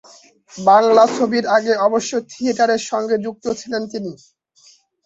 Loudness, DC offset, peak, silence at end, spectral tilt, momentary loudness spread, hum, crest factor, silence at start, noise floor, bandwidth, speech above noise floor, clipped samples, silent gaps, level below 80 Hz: -17 LUFS; under 0.1%; -2 dBFS; 0.9 s; -4 dB/octave; 12 LU; none; 16 dB; 0.55 s; -52 dBFS; 8 kHz; 35 dB; under 0.1%; none; -64 dBFS